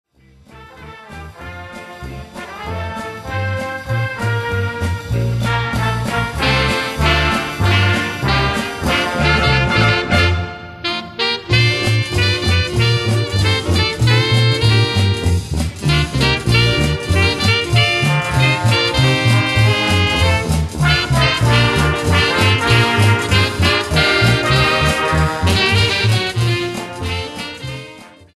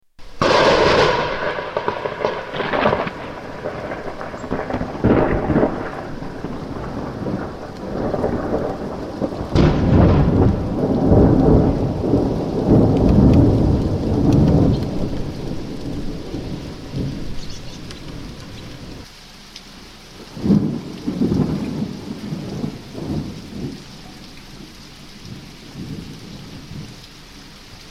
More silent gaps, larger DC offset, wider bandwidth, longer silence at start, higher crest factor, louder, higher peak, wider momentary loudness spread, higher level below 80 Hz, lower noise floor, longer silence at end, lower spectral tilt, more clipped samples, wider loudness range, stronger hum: neither; neither; about the same, 13.5 kHz vs 13.5 kHz; first, 0.5 s vs 0.2 s; about the same, 16 dB vs 18 dB; first, -15 LUFS vs -19 LUFS; about the same, 0 dBFS vs -2 dBFS; second, 12 LU vs 23 LU; about the same, -28 dBFS vs -30 dBFS; first, -47 dBFS vs -40 dBFS; first, 0.25 s vs 0 s; second, -5 dB/octave vs -7.5 dB/octave; neither; second, 7 LU vs 17 LU; neither